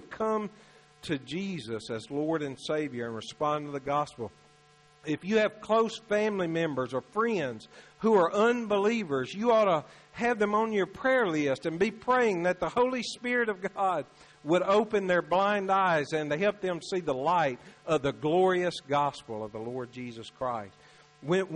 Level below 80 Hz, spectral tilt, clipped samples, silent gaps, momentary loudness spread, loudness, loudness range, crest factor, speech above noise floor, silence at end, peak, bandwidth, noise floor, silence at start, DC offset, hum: -66 dBFS; -5.5 dB/octave; under 0.1%; none; 12 LU; -29 LUFS; 6 LU; 16 dB; 31 dB; 0 s; -14 dBFS; 11 kHz; -60 dBFS; 0 s; under 0.1%; none